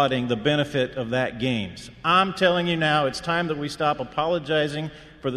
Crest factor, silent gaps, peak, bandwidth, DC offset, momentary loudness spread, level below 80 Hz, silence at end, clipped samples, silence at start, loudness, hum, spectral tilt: 18 dB; none; -6 dBFS; 13 kHz; under 0.1%; 8 LU; -52 dBFS; 0 s; under 0.1%; 0 s; -23 LUFS; none; -5.5 dB/octave